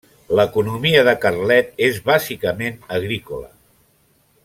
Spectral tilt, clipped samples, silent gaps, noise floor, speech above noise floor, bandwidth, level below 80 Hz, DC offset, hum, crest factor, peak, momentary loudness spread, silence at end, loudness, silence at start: -5 dB/octave; under 0.1%; none; -59 dBFS; 41 dB; 16.5 kHz; -52 dBFS; under 0.1%; none; 18 dB; 0 dBFS; 11 LU; 1 s; -18 LUFS; 0.3 s